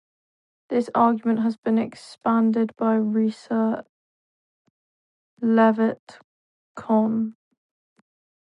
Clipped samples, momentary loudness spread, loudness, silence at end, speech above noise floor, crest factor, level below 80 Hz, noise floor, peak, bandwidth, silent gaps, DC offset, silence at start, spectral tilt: under 0.1%; 10 LU; -22 LUFS; 1.2 s; over 69 dB; 18 dB; -74 dBFS; under -90 dBFS; -6 dBFS; 9.2 kHz; 1.58-1.62 s, 3.89-5.37 s, 5.99-6.07 s, 6.24-6.75 s; under 0.1%; 0.7 s; -8 dB/octave